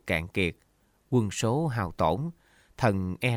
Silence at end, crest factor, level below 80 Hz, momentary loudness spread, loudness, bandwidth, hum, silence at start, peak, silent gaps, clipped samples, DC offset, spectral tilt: 0 s; 18 dB; -50 dBFS; 4 LU; -28 LUFS; 16 kHz; none; 0.05 s; -10 dBFS; none; under 0.1%; under 0.1%; -6 dB/octave